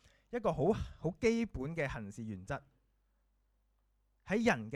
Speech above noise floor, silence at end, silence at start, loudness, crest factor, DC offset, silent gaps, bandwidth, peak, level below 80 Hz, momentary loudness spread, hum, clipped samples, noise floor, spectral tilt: 41 dB; 0 s; 0.3 s; -36 LUFS; 22 dB; under 0.1%; none; 11.5 kHz; -16 dBFS; -56 dBFS; 12 LU; none; under 0.1%; -76 dBFS; -6.5 dB/octave